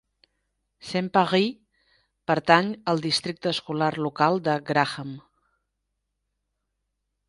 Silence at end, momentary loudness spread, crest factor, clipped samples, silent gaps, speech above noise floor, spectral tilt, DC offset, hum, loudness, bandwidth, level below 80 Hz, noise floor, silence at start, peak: 2.1 s; 14 LU; 26 dB; under 0.1%; none; 56 dB; -5 dB/octave; under 0.1%; 50 Hz at -55 dBFS; -24 LUFS; 11.5 kHz; -66 dBFS; -79 dBFS; 0.85 s; -2 dBFS